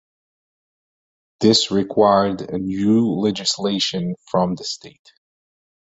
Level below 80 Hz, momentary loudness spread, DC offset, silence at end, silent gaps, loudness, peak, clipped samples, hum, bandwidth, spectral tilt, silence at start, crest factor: -54 dBFS; 10 LU; under 0.1%; 1.05 s; none; -19 LUFS; -2 dBFS; under 0.1%; none; 8.2 kHz; -5 dB/octave; 1.4 s; 20 dB